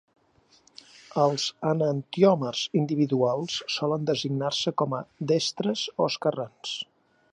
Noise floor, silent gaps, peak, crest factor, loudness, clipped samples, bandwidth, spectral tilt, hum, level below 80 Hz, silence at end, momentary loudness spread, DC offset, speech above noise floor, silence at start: -62 dBFS; none; -8 dBFS; 20 dB; -26 LUFS; under 0.1%; 10.5 kHz; -5 dB/octave; none; -72 dBFS; 0.5 s; 11 LU; under 0.1%; 37 dB; 1.1 s